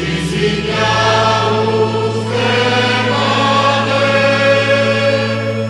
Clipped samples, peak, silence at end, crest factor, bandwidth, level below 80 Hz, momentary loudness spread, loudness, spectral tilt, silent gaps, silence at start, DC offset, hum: under 0.1%; -2 dBFS; 0 s; 12 dB; 11.5 kHz; -40 dBFS; 4 LU; -13 LUFS; -5 dB/octave; none; 0 s; under 0.1%; none